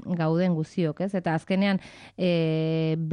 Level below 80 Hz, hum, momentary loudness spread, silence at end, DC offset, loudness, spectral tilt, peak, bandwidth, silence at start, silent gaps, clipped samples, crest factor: -64 dBFS; none; 5 LU; 0 s; under 0.1%; -26 LUFS; -8 dB/octave; -14 dBFS; 10 kHz; 0.05 s; none; under 0.1%; 12 dB